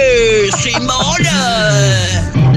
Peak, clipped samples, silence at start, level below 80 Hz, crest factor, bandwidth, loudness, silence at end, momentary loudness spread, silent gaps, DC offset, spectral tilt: -2 dBFS; under 0.1%; 0 s; -28 dBFS; 10 dB; 13.5 kHz; -12 LUFS; 0 s; 3 LU; none; under 0.1%; -4 dB/octave